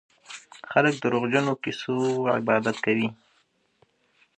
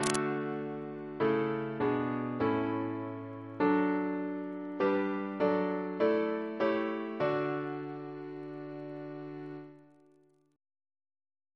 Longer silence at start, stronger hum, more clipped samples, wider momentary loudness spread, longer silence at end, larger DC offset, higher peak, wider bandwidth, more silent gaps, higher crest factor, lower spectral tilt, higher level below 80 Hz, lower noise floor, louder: first, 0.3 s vs 0 s; neither; neither; first, 18 LU vs 13 LU; second, 1.25 s vs 1.75 s; neither; first, -4 dBFS vs -8 dBFS; second, 9.6 kHz vs 11 kHz; neither; about the same, 22 dB vs 26 dB; about the same, -5.5 dB/octave vs -6 dB/octave; about the same, -72 dBFS vs -70 dBFS; about the same, -67 dBFS vs -66 dBFS; first, -25 LUFS vs -33 LUFS